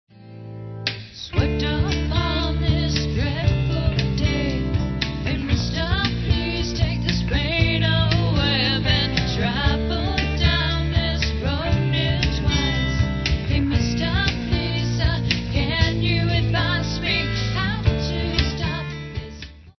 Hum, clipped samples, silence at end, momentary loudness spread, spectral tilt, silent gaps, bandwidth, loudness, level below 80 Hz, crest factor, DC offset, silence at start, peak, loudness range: none; under 0.1%; 0.1 s; 6 LU; -6 dB/octave; none; 6.4 kHz; -22 LUFS; -28 dBFS; 18 dB; under 0.1%; 0.2 s; -4 dBFS; 3 LU